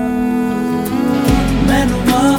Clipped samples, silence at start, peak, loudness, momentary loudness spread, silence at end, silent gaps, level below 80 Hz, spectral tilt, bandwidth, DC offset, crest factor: under 0.1%; 0 s; 0 dBFS; -15 LUFS; 4 LU; 0 s; none; -26 dBFS; -6 dB/octave; 18.5 kHz; under 0.1%; 12 dB